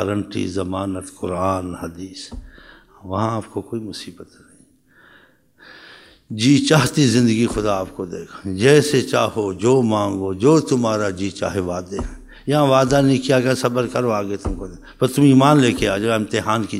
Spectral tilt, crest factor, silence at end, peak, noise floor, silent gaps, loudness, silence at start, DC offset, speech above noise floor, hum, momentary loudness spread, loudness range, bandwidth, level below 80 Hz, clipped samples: -5.5 dB/octave; 18 dB; 0 s; 0 dBFS; -53 dBFS; none; -18 LUFS; 0 s; under 0.1%; 35 dB; none; 17 LU; 12 LU; 16 kHz; -42 dBFS; under 0.1%